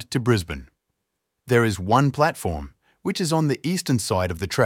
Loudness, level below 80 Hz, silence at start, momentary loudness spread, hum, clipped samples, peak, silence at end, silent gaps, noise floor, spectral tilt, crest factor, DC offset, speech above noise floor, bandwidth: -22 LUFS; -44 dBFS; 0 s; 13 LU; none; under 0.1%; -4 dBFS; 0 s; none; -79 dBFS; -5.5 dB/octave; 18 dB; under 0.1%; 57 dB; 17 kHz